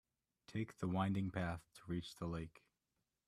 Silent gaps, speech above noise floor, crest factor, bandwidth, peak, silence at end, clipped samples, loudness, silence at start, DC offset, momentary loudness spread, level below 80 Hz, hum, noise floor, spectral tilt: none; 46 dB; 20 dB; 13 kHz; -24 dBFS; 0.8 s; under 0.1%; -44 LUFS; 0.5 s; under 0.1%; 10 LU; -66 dBFS; none; -89 dBFS; -7 dB/octave